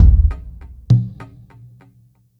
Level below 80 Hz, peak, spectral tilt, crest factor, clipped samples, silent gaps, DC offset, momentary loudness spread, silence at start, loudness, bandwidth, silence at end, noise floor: -20 dBFS; 0 dBFS; -10 dB/octave; 16 dB; under 0.1%; none; under 0.1%; 24 LU; 0 s; -17 LUFS; 5.2 kHz; 1.15 s; -53 dBFS